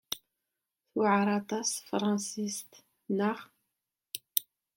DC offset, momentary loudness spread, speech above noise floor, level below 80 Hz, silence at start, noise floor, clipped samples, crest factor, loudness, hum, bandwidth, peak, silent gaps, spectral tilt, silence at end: under 0.1%; 14 LU; 56 dB; -76 dBFS; 0.1 s; -87 dBFS; under 0.1%; 28 dB; -32 LUFS; none; 17 kHz; -6 dBFS; none; -4 dB/octave; 0.35 s